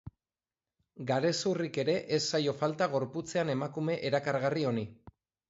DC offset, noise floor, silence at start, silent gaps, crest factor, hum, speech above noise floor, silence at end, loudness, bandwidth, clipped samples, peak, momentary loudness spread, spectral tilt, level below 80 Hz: under 0.1%; under -90 dBFS; 0.05 s; none; 16 dB; none; over 59 dB; 0.4 s; -32 LUFS; 8 kHz; under 0.1%; -16 dBFS; 4 LU; -5 dB/octave; -68 dBFS